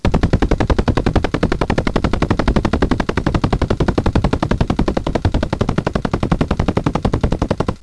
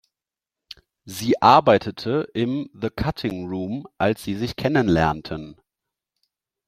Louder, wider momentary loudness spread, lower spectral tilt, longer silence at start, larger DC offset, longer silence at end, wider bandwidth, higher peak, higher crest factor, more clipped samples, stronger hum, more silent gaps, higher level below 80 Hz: first, -18 LUFS vs -21 LUFS; second, 3 LU vs 17 LU; about the same, -7 dB/octave vs -6 dB/octave; second, 0.05 s vs 0.7 s; first, 0.4% vs under 0.1%; second, 0.05 s vs 1.15 s; second, 11 kHz vs 16 kHz; second, -4 dBFS vs 0 dBFS; second, 12 dB vs 22 dB; neither; neither; neither; first, -22 dBFS vs -48 dBFS